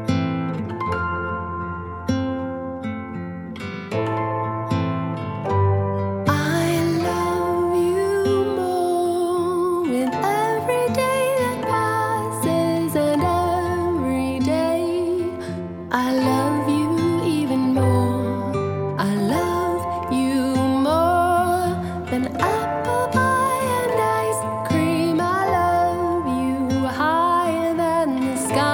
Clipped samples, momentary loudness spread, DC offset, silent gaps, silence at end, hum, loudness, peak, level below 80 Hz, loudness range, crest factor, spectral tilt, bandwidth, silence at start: under 0.1%; 7 LU; under 0.1%; none; 0 s; none; -21 LUFS; -2 dBFS; -48 dBFS; 5 LU; 18 dB; -6 dB/octave; 17.5 kHz; 0 s